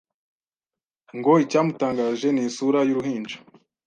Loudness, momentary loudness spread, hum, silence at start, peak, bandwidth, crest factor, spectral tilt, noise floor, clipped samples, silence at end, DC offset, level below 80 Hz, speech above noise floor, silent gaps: -22 LUFS; 15 LU; none; 1.15 s; -4 dBFS; 9.2 kHz; 18 dB; -6 dB/octave; under -90 dBFS; under 0.1%; 0.5 s; under 0.1%; -68 dBFS; over 68 dB; none